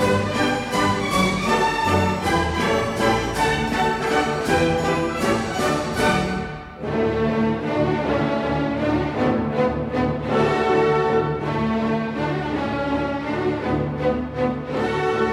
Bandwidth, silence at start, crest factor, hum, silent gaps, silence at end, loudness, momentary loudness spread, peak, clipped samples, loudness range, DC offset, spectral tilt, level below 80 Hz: 15.5 kHz; 0 s; 14 dB; none; none; 0 s; -21 LUFS; 5 LU; -6 dBFS; under 0.1%; 3 LU; under 0.1%; -5.5 dB/octave; -40 dBFS